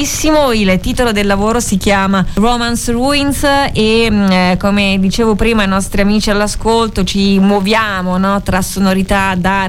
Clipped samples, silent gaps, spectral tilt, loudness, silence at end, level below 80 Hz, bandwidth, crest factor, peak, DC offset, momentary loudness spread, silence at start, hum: under 0.1%; none; -4.5 dB/octave; -12 LUFS; 0 s; -24 dBFS; 16 kHz; 10 dB; 0 dBFS; under 0.1%; 3 LU; 0 s; none